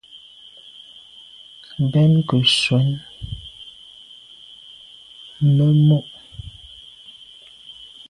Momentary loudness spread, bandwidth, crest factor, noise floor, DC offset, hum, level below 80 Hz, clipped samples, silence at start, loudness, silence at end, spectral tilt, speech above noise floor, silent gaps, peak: 26 LU; 11 kHz; 18 dB; -45 dBFS; under 0.1%; none; -50 dBFS; under 0.1%; 0.15 s; -17 LUFS; 0.4 s; -6 dB/octave; 29 dB; none; -4 dBFS